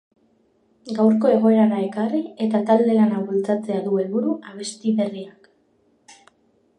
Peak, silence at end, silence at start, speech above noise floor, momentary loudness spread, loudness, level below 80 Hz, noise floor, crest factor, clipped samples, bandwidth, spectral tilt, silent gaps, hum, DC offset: -4 dBFS; 0.65 s; 0.85 s; 43 dB; 12 LU; -20 LUFS; -74 dBFS; -62 dBFS; 18 dB; under 0.1%; 9.6 kHz; -7 dB/octave; none; none; under 0.1%